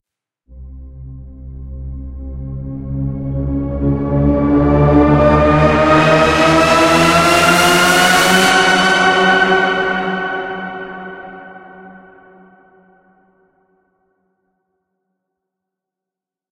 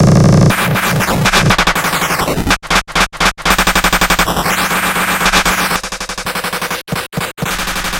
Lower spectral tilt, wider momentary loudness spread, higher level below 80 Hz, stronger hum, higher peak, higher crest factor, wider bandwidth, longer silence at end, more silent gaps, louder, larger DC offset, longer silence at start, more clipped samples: about the same, -4.5 dB/octave vs -3.5 dB/octave; first, 20 LU vs 9 LU; about the same, -30 dBFS vs -26 dBFS; neither; about the same, 0 dBFS vs 0 dBFS; about the same, 16 dB vs 12 dB; about the same, 16 kHz vs 17.5 kHz; first, 4.6 s vs 0 s; neither; about the same, -12 LUFS vs -12 LUFS; neither; first, 0.5 s vs 0 s; neither